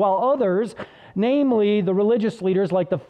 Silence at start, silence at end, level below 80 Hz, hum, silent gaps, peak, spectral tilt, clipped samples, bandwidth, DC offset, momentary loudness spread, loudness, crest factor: 0 s; 0.05 s; -64 dBFS; none; none; -10 dBFS; -8 dB/octave; under 0.1%; 9.6 kHz; under 0.1%; 8 LU; -20 LUFS; 10 dB